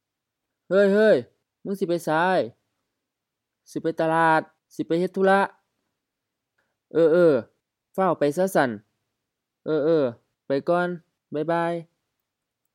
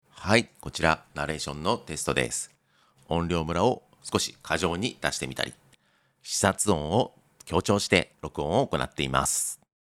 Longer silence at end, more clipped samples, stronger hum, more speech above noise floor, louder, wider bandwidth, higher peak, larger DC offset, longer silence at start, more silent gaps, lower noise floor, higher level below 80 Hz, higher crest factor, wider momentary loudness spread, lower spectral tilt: first, 0.9 s vs 0.3 s; neither; neither; first, 62 dB vs 39 dB; first, -23 LUFS vs -27 LUFS; about the same, 16 kHz vs 16.5 kHz; about the same, -6 dBFS vs -4 dBFS; neither; first, 0.7 s vs 0.15 s; neither; first, -84 dBFS vs -66 dBFS; second, -80 dBFS vs -50 dBFS; second, 18 dB vs 24 dB; first, 15 LU vs 9 LU; first, -6.5 dB/octave vs -3.5 dB/octave